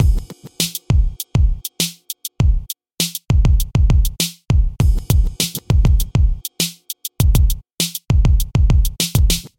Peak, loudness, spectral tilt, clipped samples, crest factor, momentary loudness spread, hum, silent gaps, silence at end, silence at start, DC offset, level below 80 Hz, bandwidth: 0 dBFS; -18 LUFS; -4.5 dB/octave; under 0.1%; 16 dB; 6 LU; none; 7.74-7.78 s; 0.1 s; 0 s; under 0.1%; -18 dBFS; 17 kHz